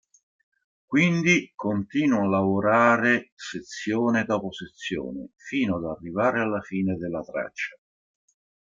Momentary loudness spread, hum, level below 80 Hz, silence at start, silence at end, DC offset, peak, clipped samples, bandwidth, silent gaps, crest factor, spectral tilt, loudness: 14 LU; none; -62 dBFS; 0.9 s; 0.95 s; under 0.1%; -6 dBFS; under 0.1%; 7.6 kHz; 3.32-3.37 s; 20 dB; -6 dB/octave; -24 LUFS